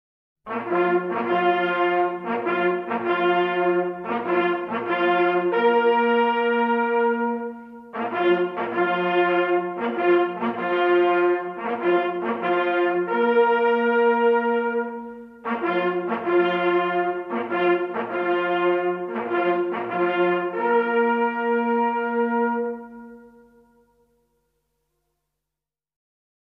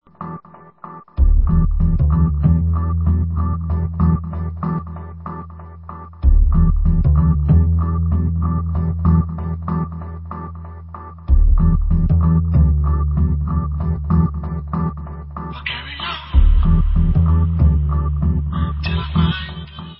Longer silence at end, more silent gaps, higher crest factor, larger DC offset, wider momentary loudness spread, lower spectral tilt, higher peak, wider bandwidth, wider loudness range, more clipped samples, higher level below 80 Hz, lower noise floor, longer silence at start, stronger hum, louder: first, 3.3 s vs 0.05 s; neither; about the same, 14 dB vs 14 dB; second, under 0.1% vs 0.1%; second, 8 LU vs 16 LU; second, -8 dB/octave vs -12.5 dB/octave; second, -8 dBFS vs -2 dBFS; about the same, 5.2 kHz vs 5.6 kHz; about the same, 3 LU vs 4 LU; neither; second, -72 dBFS vs -18 dBFS; first, -88 dBFS vs -40 dBFS; first, 0.45 s vs 0.2 s; neither; second, -22 LUFS vs -18 LUFS